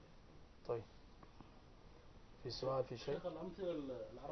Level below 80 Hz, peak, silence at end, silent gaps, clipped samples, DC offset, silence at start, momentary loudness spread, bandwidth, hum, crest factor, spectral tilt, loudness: -64 dBFS; -28 dBFS; 0 s; none; under 0.1%; under 0.1%; 0 s; 22 LU; 6.2 kHz; none; 18 dB; -5 dB/octave; -46 LUFS